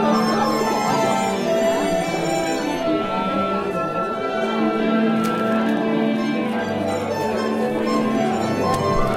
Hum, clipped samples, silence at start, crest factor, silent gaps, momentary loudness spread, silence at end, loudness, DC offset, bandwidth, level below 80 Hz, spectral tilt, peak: none; under 0.1%; 0 s; 12 dB; none; 4 LU; 0 s; -21 LUFS; under 0.1%; 16 kHz; -42 dBFS; -5.5 dB/octave; -8 dBFS